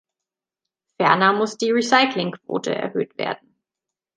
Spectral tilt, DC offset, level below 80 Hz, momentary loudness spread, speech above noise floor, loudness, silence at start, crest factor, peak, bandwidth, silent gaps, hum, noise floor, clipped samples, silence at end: -4 dB/octave; under 0.1%; -74 dBFS; 11 LU; 67 dB; -20 LUFS; 1 s; 20 dB; -2 dBFS; 9.8 kHz; none; none; -87 dBFS; under 0.1%; 0.8 s